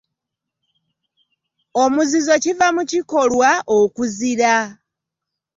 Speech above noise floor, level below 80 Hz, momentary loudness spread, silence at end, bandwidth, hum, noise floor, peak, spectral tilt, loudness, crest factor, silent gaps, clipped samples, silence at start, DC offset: 66 dB; -60 dBFS; 6 LU; 0.85 s; 7.8 kHz; none; -82 dBFS; -2 dBFS; -3 dB/octave; -17 LUFS; 16 dB; none; under 0.1%; 1.75 s; under 0.1%